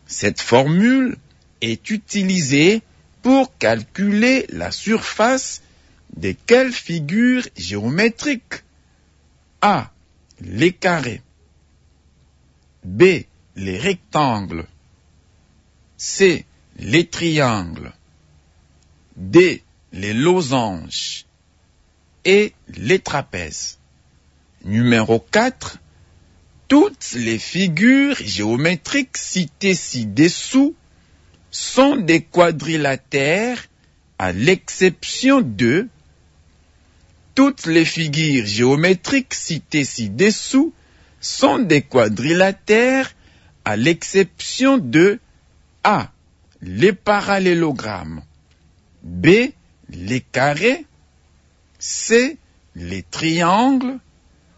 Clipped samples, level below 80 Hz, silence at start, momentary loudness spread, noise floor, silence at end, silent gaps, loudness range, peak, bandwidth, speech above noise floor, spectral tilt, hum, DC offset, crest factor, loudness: under 0.1%; -52 dBFS; 0.1 s; 14 LU; -57 dBFS; 0.6 s; none; 4 LU; -2 dBFS; 8 kHz; 40 dB; -4.5 dB/octave; none; under 0.1%; 18 dB; -17 LUFS